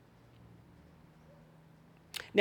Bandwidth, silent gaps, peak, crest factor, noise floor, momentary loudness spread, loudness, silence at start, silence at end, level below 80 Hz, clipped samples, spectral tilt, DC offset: 19 kHz; none; -10 dBFS; 30 dB; -60 dBFS; 16 LU; -37 LUFS; 2.2 s; 0 s; -72 dBFS; under 0.1%; -4.5 dB/octave; under 0.1%